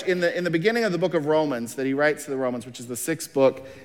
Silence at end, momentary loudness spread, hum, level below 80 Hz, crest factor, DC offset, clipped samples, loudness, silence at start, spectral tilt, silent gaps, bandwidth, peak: 0 s; 7 LU; none; -70 dBFS; 16 dB; under 0.1%; under 0.1%; -24 LUFS; 0 s; -5 dB/octave; none; 17.5 kHz; -8 dBFS